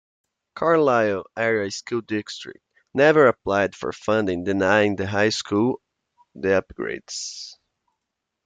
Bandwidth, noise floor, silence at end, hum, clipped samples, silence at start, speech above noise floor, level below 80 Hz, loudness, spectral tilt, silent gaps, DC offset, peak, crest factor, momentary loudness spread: 9.4 kHz; -81 dBFS; 0.9 s; none; under 0.1%; 0.55 s; 60 dB; -60 dBFS; -22 LUFS; -5 dB/octave; none; under 0.1%; -4 dBFS; 20 dB; 14 LU